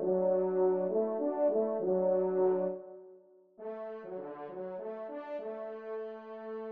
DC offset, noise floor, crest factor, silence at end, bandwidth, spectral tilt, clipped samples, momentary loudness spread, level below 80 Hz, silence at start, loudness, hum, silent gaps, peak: under 0.1%; -59 dBFS; 14 dB; 0 s; 3.4 kHz; -8.5 dB/octave; under 0.1%; 14 LU; -88 dBFS; 0 s; -33 LUFS; none; none; -20 dBFS